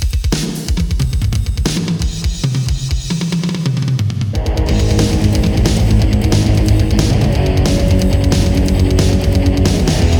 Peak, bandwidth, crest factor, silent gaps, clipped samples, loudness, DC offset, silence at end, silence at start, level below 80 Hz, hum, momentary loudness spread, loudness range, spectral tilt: 0 dBFS; 18.5 kHz; 12 dB; none; under 0.1%; -15 LUFS; under 0.1%; 0 s; 0 s; -18 dBFS; none; 5 LU; 4 LU; -6 dB/octave